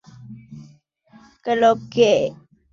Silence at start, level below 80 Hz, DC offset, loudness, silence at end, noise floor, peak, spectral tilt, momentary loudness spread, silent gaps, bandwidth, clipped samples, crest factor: 0.2 s; -60 dBFS; under 0.1%; -19 LUFS; 0.4 s; -52 dBFS; -2 dBFS; -5 dB/octave; 23 LU; none; 7.6 kHz; under 0.1%; 20 dB